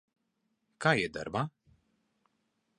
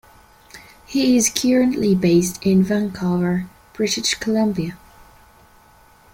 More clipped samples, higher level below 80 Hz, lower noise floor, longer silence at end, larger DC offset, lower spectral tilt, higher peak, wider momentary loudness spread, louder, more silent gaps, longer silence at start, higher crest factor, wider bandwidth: neither; second, -66 dBFS vs -50 dBFS; first, -80 dBFS vs -51 dBFS; about the same, 1.3 s vs 1.4 s; neither; about the same, -5.5 dB/octave vs -4.5 dB/octave; second, -10 dBFS vs 0 dBFS; about the same, 8 LU vs 10 LU; second, -32 LUFS vs -19 LUFS; neither; first, 0.8 s vs 0.55 s; first, 26 dB vs 20 dB; second, 10.5 kHz vs 16.5 kHz